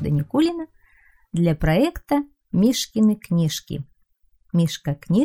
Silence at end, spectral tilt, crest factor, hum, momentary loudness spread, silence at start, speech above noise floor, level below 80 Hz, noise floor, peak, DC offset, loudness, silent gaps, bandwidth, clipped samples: 0 s; -6 dB/octave; 16 dB; none; 13 LU; 0 s; 42 dB; -42 dBFS; -62 dBFS; -6 dBFS; 0.1%; -22 LUFS; none; 16.5 kHz; under 0.1%